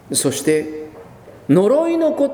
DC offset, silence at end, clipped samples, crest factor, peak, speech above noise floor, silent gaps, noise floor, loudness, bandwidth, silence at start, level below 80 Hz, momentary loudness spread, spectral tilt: under 0.1%; 0 s; under 0.1%; 16 dB; -2 dBFS; 24 dB; none; -40 dBFS; -17 LUFS; over 20 kHz; 0.1 s; -58 dBFS; 19 LU; -5 dB/octave